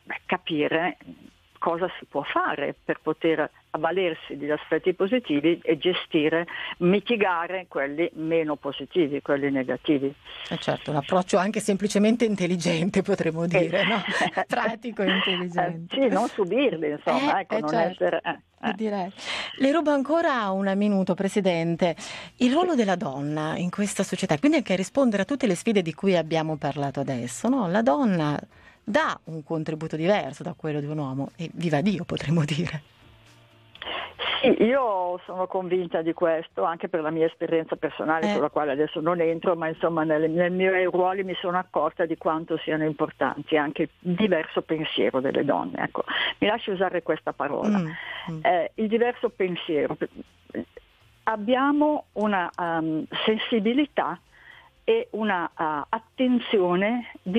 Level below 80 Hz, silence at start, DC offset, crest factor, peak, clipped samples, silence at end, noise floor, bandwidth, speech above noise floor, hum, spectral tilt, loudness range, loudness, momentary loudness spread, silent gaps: -64 dBFS; 0.05 s; under 0.1%; 16 dB; -8 dBFS; under 0.1%; 0 s; -54 dBFS; 13 kHz; 29 dB; none; -5.5 dB/octave; 3 LU; -25 LUFS; 8 LU; none